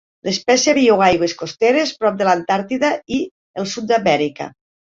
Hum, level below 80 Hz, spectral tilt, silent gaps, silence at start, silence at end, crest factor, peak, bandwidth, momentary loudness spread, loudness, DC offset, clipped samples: none; -54 dBFS; -3.5 dB/octave; 3.31-3.54 s; 0.25 s; 0.4 s; 16 dB; -2 dBFS; 7.8 kHz; 12 LU; -17 LUFS; under 0.1%; under 0.1%